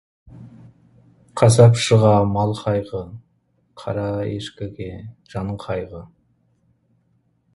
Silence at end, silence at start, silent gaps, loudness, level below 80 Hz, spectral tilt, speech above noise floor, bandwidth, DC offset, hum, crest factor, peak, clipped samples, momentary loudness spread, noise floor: 1.5 s; 0.35 s; none; -19 LUFS; -48 dBFS; -6.5 dB/octave; 46 dB; 11.5 kHz; under 0.1%; none; 20 dB; 0 dBFS; under 0.1%; 22 LU; -64 dBFS